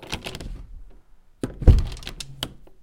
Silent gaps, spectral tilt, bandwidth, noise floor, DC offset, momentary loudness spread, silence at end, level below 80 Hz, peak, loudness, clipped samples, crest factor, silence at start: none; -6 dB/octave; 16.5 kHz; -49 dBFS; under 0.1%; 19 LU; 0.35 s; -26 dBFS; 0 dBFS; -25 LUFS; under 0.1%; 24 dB; 0 s